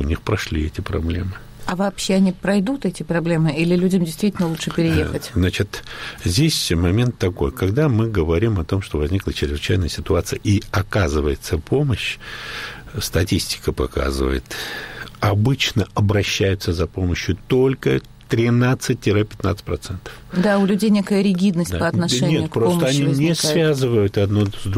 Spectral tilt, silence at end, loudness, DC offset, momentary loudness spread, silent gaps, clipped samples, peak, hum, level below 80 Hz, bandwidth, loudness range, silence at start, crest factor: -5.5 dB/octave; 0 s; -20 LUFS; under 0.1%; 9 LU; none; under 0.1%; -6 dBFS; none; -34 dBFS; 16 kHz; 4 LU; 0 s; 12 dB